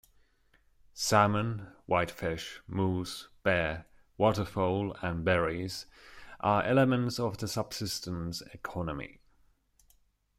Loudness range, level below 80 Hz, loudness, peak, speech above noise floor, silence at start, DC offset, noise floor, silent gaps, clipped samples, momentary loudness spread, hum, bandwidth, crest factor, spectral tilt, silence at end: 2 LU; -56 dBFS; -31 LUFS; -8 dBFS; 37 dB; 0.95 s; under 0.1%; -68 dBFS; none; under 0.1%; 14 LU; none; 16 kHz; 24 dB; -5 dB/octave; 1.3 s